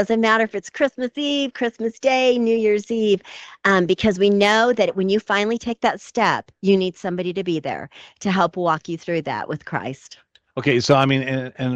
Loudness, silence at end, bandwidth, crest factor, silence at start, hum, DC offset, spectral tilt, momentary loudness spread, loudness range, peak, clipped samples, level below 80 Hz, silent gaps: -20 LUFS; 0 s; 9 kHz; 18 dB; 0 s; none; under 0.1%; -5.5 dB/octave; 11 LU; 6 LU; -2 dBFS; under 0.1%; -56 dBFS; none